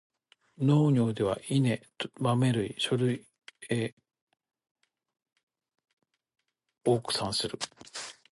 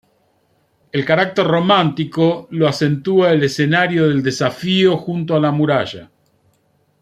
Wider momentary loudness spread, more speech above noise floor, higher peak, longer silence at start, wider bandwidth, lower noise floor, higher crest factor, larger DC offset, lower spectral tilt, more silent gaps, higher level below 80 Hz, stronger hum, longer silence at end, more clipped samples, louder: first, 13 LU vs 6 LU; second, 32 dB vs 45 dB; second, -14 dBFS vs -2 dBFS; second, 0.6 s vs 0.95 s; second, 11.5 kHz vs 13.5 kHz; about the same, -61 dBFS vs -61 dBFS; about the same, 18 dB vs 16 dB; neither; about the same, -6 dB/octave vs -6 dB/octave; first, 3.93-3.97 s, 4.22-4.27 s, 4.71-4.75 s, 5.43-5.47 s, 5.93-5.97 s vs none; second, -66 dBFS vs -58 dBFS; neither; second, 0.2 s vs 0.95 s; neither; second, -29 LUFS vs -16 LUFS